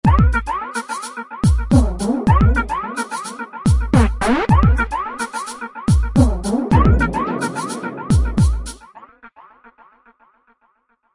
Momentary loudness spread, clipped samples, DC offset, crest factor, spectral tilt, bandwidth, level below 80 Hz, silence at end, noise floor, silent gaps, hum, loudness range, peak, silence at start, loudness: 12 LU; under 0.1%; under 0.1%; 16 dB; -7 dB/octave; 11.5 kHz; -22 dBFS; 1.9 s; -62 dBFS; none; none; 6 LU; 0 dBFS; 0.05 s; -18 LUFS